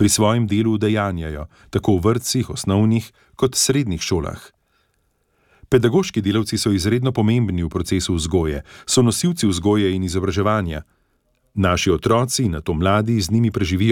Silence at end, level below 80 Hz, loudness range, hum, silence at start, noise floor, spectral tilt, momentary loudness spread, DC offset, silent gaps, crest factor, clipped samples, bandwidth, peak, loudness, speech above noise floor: 0 s; -38 dBFS; 2 LU; none; 0 s; -66 dBFS; -5 dB/octave; 7 LU; under 0.1%; none; 16 dB; under 0.1%; 17.5 kHz; -4 dBFS; -19 LUFS; 47 dB